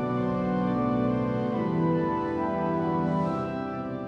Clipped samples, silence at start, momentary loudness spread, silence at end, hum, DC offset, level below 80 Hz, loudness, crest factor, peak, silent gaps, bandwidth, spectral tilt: under 0.1%; 0 s; 4 LU; 0 s; none; under 0.1%; -52 dBFS; -27 LUFS; 14 dB; -14 dBFS; none; 6.8 kHz; -9.5 dB/octave